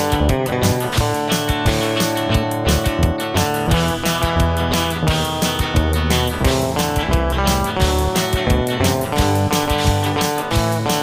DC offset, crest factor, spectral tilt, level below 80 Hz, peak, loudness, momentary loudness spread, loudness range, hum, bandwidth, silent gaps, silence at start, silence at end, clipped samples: under 0.1%; 14 dB; -4.5 dB/octave; -26 dBFS; -4 dBFS; -18 LUFS; 2 LU; 1 LU; none; 16 kHz; none; 0 s; 0 s; under 0.1%